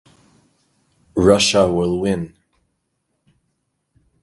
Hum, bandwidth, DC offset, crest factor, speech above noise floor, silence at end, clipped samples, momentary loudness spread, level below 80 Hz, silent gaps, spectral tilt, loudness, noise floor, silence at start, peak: none; 11.5 kHz; under 0.1%; 20 dB; 56 dB; 1.95 s; under 0.1%; 13 LU; -44 dBFS; none; -4.5 dB/octave; -17 LUFS; -72 dBFS; 1.15 s; 0 dBFS